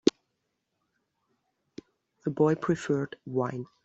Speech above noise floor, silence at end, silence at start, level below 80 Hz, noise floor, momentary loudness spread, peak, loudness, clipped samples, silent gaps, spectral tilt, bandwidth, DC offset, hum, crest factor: 52 dB; 0.2 s; 0.05 s; -70 dBFS; -80 dBFS; 24 LU; -4 dBFS; -29 LUFS; under 0.1%; none; -6 dB/octave; 8 kHz; under 0.1%; none; 26 dB